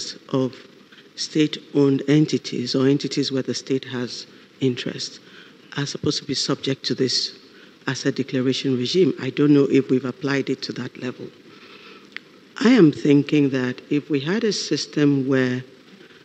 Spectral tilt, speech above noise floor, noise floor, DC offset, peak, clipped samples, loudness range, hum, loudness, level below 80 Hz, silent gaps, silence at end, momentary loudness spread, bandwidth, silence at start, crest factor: -5.5 dB/octave; 26 dB; -47 dBFS; under 0.1%; -2 dBFS; under 0.1%; 5 LU; none; -21 LUFS; -70 dBFS; none; 0.6 s; 15 LU; 9 kHz; 0 s; 20 dB